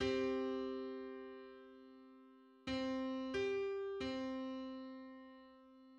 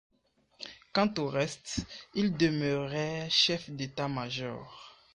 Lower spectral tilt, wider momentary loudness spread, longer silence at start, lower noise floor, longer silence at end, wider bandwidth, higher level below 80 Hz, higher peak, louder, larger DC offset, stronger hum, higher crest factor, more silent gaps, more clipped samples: about the same, -5.5 dB/octave vs -4.5 dB/octave; about the same, 21 LU vs 19 LU; second, 0 s vs 0.6 s; second, -64 dBFS vs -70 dBFS; second, 0 s vs 0.25 s; second, 8.6 kHz vs 10.5 kHz; second, -68 dBFS vs -58 dBFS; second, -26 dBFS vs -12 dBFS; second, -43 LUFS vs -31 LUFS; neither; neither; about the same, 18 dB vs 20 dB; neither; neither